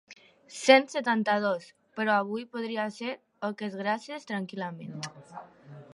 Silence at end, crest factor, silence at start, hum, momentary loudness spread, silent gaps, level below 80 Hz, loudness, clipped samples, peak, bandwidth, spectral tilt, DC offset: 0.1 s; 26 dB; 0.1 s; none; 19 LU; none; -82 dBFS; -29 LUFS; under 0.1%; -4 dBFS; 11.5 kHz; -4 dB/octave; under 0.1%